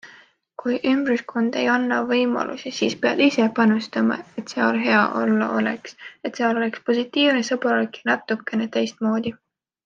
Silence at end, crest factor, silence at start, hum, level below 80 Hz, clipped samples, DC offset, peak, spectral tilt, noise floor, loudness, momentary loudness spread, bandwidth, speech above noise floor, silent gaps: 0.55 s; 18 dB; 0.05 s; none; -70 dBFS; under 0.1%; under 0.1%; -4 dBFS; -5 dB/octave; -51 dBFS; -21 LUFS; 10 LU; 7.4 kHz; 30 dB; none